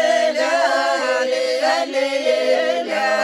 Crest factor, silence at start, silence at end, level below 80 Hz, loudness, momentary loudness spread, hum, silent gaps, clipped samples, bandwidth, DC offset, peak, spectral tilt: 12 dB; 0 s; 0 s; -74 dBFS; -18 LUFS; 3 LU; none; none; under 0.1%; 13.5 kHz; under 0.1%; -6 dBFS; -1 dB/octave